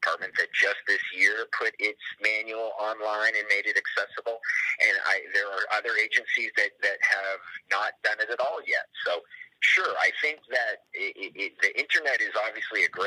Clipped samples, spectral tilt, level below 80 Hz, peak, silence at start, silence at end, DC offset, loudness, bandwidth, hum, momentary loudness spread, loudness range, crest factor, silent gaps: under 0.1%; 0 dB/octave; -88 dBFS; -8 dBFS; 0 s; 0 s; under 0.1%; -26 LUFS; 14.5 kHz; none; 9 LU; 2 LU; 18 dB; none